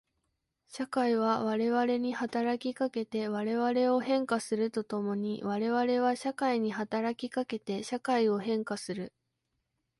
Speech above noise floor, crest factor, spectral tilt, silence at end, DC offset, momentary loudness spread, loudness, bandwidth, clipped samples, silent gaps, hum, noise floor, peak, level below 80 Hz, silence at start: 51 dB; 16 dB; -5.5 dB/octave; 0.9 s; under 0.1%; 7 LU; -31 LUFS; 11.5 kHz; under 0.1%; none; none; -82 dBFS; -16 dBFS; -74 dBFS; 0.7 s